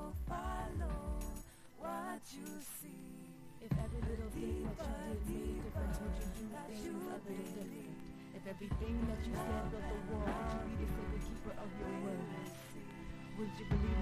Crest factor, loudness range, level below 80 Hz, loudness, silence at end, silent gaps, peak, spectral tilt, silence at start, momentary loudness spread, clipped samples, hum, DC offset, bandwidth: 18 dB; 4 LU; -46 dBFS; -44 LUFS; 0 s; none; -24 dBFS; -6.5 dB/octave; 0 s; 10 LU; under 0.1%; none; under 0.1%; 15.5 kHz